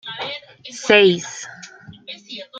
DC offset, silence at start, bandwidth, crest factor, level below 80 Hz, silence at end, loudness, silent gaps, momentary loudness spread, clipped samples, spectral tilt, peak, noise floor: under 0.1%; 0.05 s; 9 kHz; 20 dB; -64 dBFS; 0 s; -17 LUFS; none; 26 LU; under 0.1%; -3.5 dB/octave; 0 dBFS; -41 dBFS